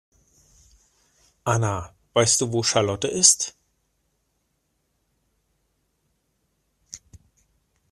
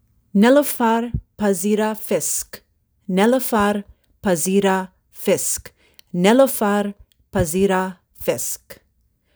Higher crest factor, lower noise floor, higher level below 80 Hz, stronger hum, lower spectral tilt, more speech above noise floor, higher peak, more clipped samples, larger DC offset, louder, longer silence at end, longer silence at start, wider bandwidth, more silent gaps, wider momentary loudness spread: first, 28 dB vs 18 dB; first, -72 dBFS vs -64 dBFS; second, -58 dBFS vs -44 dBFS; neither; second, -2.5 dB/octave vs -4.5 dB/octave; first, 51 dB vs 46 dB; about the same, 0 dBFS vs -2 dBFS; neither; neither; about the same, -21 LUFS vs -19 LUFS; first, 0.95 s vs 0.65 s; first, 1.45 s vs 0.35 s; second, 14.5 kHz vs over 20 kHz; neither; first, 26 LU vs 13 LU